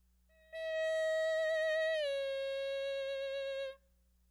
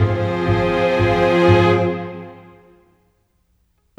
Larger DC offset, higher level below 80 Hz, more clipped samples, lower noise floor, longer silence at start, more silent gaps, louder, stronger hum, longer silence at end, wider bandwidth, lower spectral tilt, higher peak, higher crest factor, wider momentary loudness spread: neither; second, -72 dBFS vs -40 dBFS; neither; first, -71 dBFS vs -63 dBFS; first, 0.5 s vs 0 s; neither; second, -36 LUFS vs -16 LUFS; first, 60 Hz at -70 dBFS vs none; second, 0.55 s vs 1.65 s; first, 13.5 kHz vs 8.4 kHz; second, 0 dB/octave vs -7.5 dB/octave; second, -26 dBFS vs -2 dBFS; second, 10 dB vs 16 dB; second, 9 LU vs 18 LU